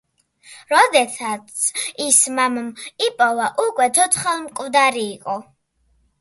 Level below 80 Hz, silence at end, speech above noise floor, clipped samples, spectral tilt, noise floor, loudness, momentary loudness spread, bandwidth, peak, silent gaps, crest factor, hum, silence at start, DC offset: -66 dBFS; 0.8 s; 44 dB; under 0.1%; -0.5 dB/octave; -63 dBFS; -18 LUFS; 12 LU; 12 kHz; 0 dBFS; none; 20 dB; none; 0.5 s; under 0.1%